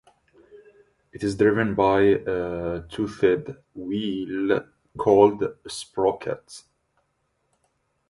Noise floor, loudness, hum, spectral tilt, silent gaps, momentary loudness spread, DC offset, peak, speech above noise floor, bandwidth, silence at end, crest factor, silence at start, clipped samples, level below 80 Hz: -72 dBFS; -23 LUFS; none; -6 dB/octave; none; 17 LU; under 0.1%; -4 dBFS; 50 dB; 11.5 kHz; 1.5 s; 22 dB; 0.55 s; under 0.1%; -52 dBFS